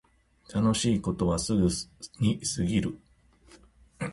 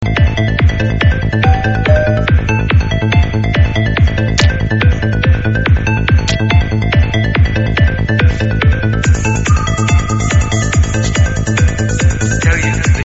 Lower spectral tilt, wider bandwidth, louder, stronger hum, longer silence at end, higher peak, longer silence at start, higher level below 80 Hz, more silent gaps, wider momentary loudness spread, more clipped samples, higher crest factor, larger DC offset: about the same, -5.5 dB/octave vs -5.5 dB/octave; first, 11.5 kHz vs 8 kHz; second, -28 LUFS vs -12 LUFS; neither; about the same, 0 s vs 0 s; second, -12 dBFS vs 0 dBFS; first, 0.5 s vs 0 s; second, -46 dBFS vs -18 dBFS; neither; first, 11 LU vs 1 LU; neither; first, 18 dB vs 12 dB; neither